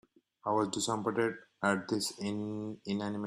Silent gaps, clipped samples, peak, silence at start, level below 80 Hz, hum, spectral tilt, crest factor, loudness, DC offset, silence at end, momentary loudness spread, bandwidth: none; under 0.1%; -16 dBFS; 0.45 s; -72 dBFS; none; -4.5 dB/octave; 18 dB; -34 LUFS; under 0.1%; 0 s; 7 LU; 13.5 kHz